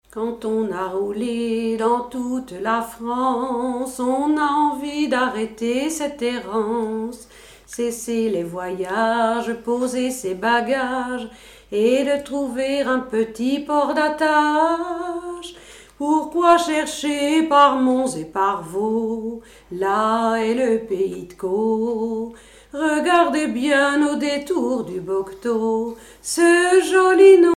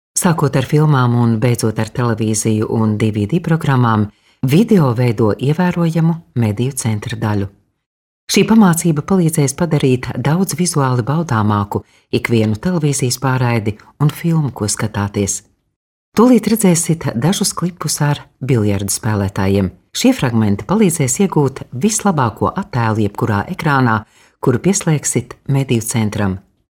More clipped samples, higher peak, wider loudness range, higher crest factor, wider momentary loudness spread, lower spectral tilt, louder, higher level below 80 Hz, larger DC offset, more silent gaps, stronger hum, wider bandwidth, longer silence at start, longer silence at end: neither; about the same, -2 dBFS vs 0 dBFS; first, 5 LU vs 2 LU; about the same, 18 dB vs 14 dB; first, 11 LU vs 7 LU; second, -4 dB/octave vs -5.5 dB/octave; second, -20 LUFS vs -15 LUFS; second, -54 dBFS vs -46 dBFS; neither; second, none vs 7.86-8.27 s, 15.76-16.12 s; neither; about the same, 15.5 kHz vs 17 kHz; about the same, 0.15 s vs 0.15 s; second, 0.05 s vs 0.35 s